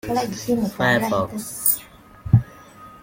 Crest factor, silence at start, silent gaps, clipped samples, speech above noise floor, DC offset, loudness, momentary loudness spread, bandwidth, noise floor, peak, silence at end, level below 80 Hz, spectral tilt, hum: 20 dB; 0.05 s; none; under 0.1%; 22 dB; under 0.1%; -21 LUFS; 8 LU; 16.5 kHz; -44 dBFS; -2 dBFS; 0.05 s; -44 dBFS; -5 dB/octave; none